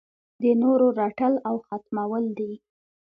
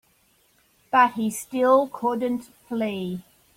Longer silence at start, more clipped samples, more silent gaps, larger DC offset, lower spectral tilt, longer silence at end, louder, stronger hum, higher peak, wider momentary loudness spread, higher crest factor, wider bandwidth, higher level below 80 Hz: second, 0.4 s vs 0.95 s; neither; neither; neither; first, -10.5 dB/octave vs -5 dB/octave; first, 0.6 s vs 0.35 s; about the same, -24 LUFS vs -23 LUFS; neither; second, -10 dBFS vs -6 dBFS; about the same, 13 LU vs 13 LU; about the same, 16 dB vs 20 dB; second, 4.8 kHz vs 16.5 kHz; second, -72 dBFS vs -66 dBFS